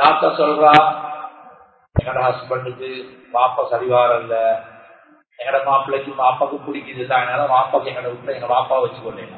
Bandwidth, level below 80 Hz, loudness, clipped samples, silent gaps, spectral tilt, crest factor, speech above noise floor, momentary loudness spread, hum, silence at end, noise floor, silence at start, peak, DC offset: 8 kHz; -44 dBFS; -18 LUFS; under 0.1%; none; -7 dB/octave; 18 dB; 32 dB; 15 LU; none; 0 s; -49 dBFS; 0 s; 0 dBFS; under 0.1%